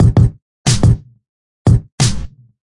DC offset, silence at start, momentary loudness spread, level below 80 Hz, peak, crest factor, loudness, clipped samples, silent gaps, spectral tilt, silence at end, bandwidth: under 0.1%; 0 s; 9 LU; -24 dBFS; -2 dBFS; 12 dB; -15 LUFS; under 0.1%; 0.42-0.65 s, 1.29-1.65 s, 1.92-1.98 s; -5.5 dB/octave; 0.4 s; 11.5 kHz